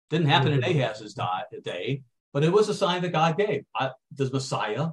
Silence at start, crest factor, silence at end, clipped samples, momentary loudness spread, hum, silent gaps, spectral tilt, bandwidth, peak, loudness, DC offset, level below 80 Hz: 0.1 s; 18 dB; 0 s; under 0.1%; 11 LU; none; 2.20-2.32 s; -6 dB/octave; 11.5 kHz; -6 dBFS; -26 LUFS; under 0.1%; -66 dBFS